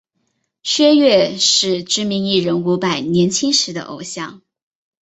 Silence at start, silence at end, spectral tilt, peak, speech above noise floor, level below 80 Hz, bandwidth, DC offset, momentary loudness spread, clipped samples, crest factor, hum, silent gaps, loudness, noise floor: 0.65 s; 0.65 s; -3.5 dB/octave; -2 dBFS; 53 dB; -58 dBFS; 8.2 kHz; under 0.1%; 15 LU; under 0.1%; 16 dB; none; none; -15 LUFS; -69 dBFS